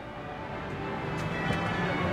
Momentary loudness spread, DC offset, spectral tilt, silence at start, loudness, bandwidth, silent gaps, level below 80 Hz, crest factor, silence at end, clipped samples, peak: 9 LU; under 0.1%; -6.5 dB/octave; 0 s; -32 LUFS; 15 kHz; none; -50 dBFS; 16 dB; 0 s; under 0.1%; -16 dBFS